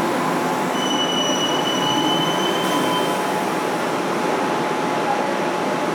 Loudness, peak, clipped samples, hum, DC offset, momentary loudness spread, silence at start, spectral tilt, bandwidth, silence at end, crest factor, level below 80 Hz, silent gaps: -20 LUFS; -8 dBFS; under 0.1%; none; under 0.1%; 3 LU; 0 s; -3.5 dB/octave; over 20 kHz; 0 s; 14 dB; -66 dBFS; none